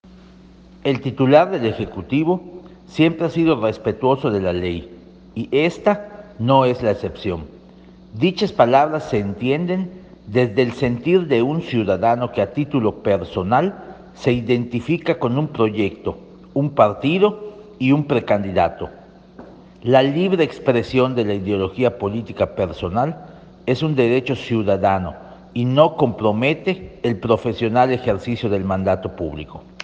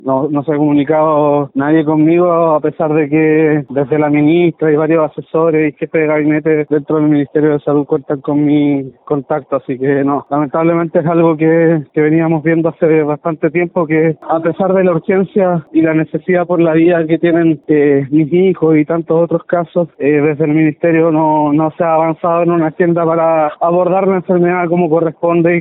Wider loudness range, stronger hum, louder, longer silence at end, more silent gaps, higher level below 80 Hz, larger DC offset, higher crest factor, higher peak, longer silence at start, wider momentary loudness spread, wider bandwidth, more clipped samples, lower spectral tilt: about the same, 2 LU vs 2 LU; neither; second, -19 LUFS vs -12 LUFS; about the same, 0 s vs 0 s; neither; first, -50 dBFS vs -56 dBFS; neither; first, 18 dB vs 12 dB; about the same, 0 dBFS vs 0 dBFS; about the same, 0.1 s vs 0.05 s; first, 13 LU vs 5 LU; first, 8.2 kHz vs 3.9 kHz; neither; second, -8 dB/octave vs -13 dB/octave